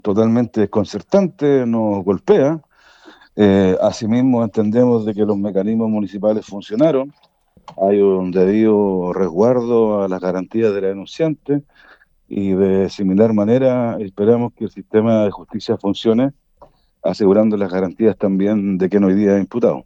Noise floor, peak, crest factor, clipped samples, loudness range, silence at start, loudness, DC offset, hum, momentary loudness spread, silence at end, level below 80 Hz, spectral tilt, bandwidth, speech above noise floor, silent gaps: -49 dBFS; -2 dBFS; 14 dB; under 0.1%; 3 LU; 0.05 s; -16 LUFS; under 0.1%; none; 8 LU; 0.05 s; -56 dBFS; -8 dB/octave; 7.8 kHz; 34 dB; none